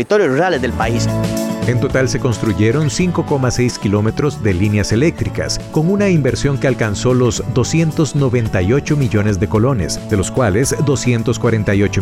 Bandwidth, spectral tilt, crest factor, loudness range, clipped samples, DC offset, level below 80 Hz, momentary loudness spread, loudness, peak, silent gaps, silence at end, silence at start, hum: 15 kHz; -6 dB/octave; 10 dB; 1 LU; under 0.1%; under 0.1%; -34 dBFS; 3 LU; -16 LUFS; -4 dBFS; none; 0 s; 0 s; none